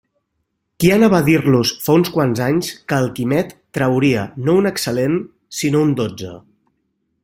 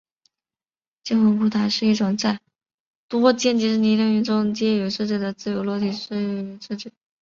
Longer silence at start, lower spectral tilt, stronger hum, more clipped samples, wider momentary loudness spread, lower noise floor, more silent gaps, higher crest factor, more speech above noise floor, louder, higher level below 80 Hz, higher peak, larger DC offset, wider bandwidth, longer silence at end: second, 0.8 s vs 1.05 s; about the same, -6 dB/octave vs -5.5 dB/octave; neither; neither; second, 10 LU vs 13 LU; second, -72 dBFS vs under -90 dBFS; second, none vs 2.74-3.09 s; about the same, 16 dB vs 18 dB; second, 56 dB vs over 69 dB; first, -17 LUFS vs -21 LUFS; first, -50 dBFS vs -64 dBFS; about the same, -2 dBFS vs -4 dBFS; neither; first, 16.5 kHz vs 7.4 kHz; first, 0.85 s vs 0.35 s